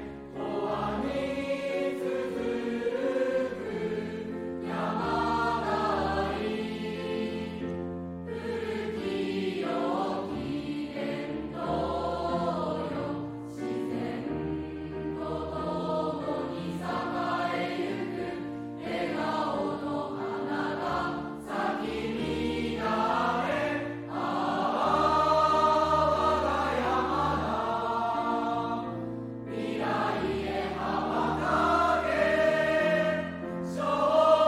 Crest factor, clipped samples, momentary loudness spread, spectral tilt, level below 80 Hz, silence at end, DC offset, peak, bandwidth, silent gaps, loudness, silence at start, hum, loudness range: 20 dB; under 0.1%; 10 LU; -6 dB/octave; -52 dBFS; 0 s; under 0.1%; -10 dBFS; 14.5 kHz; none; -30 LUFS; 0 s; none; 7 LU